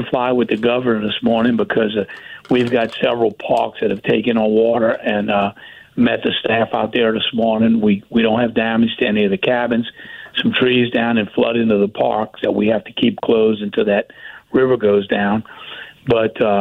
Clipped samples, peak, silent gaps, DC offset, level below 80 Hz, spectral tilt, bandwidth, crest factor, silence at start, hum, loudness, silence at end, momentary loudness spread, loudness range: under 0.1%; -4 dBFS; none; under 0.1%; -52 dBFS; -7.5 dB/octave; 5.2 kHz; 12 dB; 0 s; none; -17 LUFS; 0 s; 6 LU; 1 LU